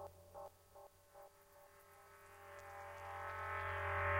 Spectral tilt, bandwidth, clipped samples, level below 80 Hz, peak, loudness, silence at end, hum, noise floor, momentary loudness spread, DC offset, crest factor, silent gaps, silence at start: -5 dB/octave; 16 kHz; under 0.1%; -66 dBFS; -26 dBFS; -47 LUFS; 0 s; none; -65 dBFS; 21 LU; under 0.1%; 20 dB; none; 0 s